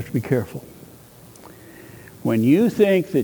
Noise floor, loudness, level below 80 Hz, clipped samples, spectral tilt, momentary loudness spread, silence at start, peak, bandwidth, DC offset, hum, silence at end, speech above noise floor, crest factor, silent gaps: -45 dBFS; -19 LUFS; -56 dBFS; under 0.1%; -7.5 dB/octave; 25 LU; 0 s; -4 dBFS; over 20 kHz; under 0.1%; none; 0 s; 27 dB; 18 dB; none